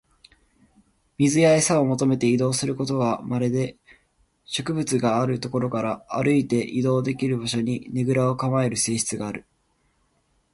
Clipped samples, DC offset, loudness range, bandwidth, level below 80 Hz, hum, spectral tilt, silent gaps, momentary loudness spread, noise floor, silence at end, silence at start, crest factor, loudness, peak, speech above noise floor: under 0.1%; under 0.1%; 4 LU; 11.5 kHz; -58 dBFS; none; -5 dB/octave; none; 9 LU; -67 dBFS; 1.15 s; 1.2 s; 18 dB; -23 LUFS; -6 dBFS; 45 dB